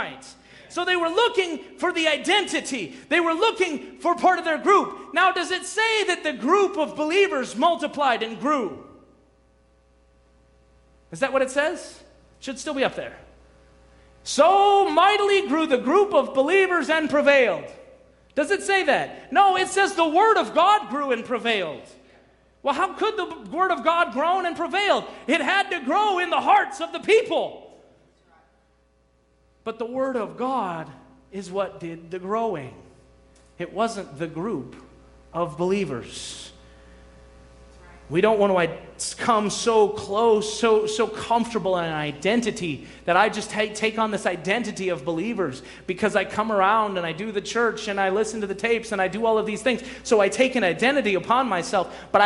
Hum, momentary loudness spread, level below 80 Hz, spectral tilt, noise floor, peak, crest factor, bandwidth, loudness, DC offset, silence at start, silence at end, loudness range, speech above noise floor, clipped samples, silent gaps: none; 13 LU; -58 dBFS; -3.5 dB/octave; -62 dBFS; -4 dBFS; 20 dB; 11.5 kHz; -22 LUFS; under 0.1%; 0 s; 0 s; 10 LU; 40 dB; under 0.1%; none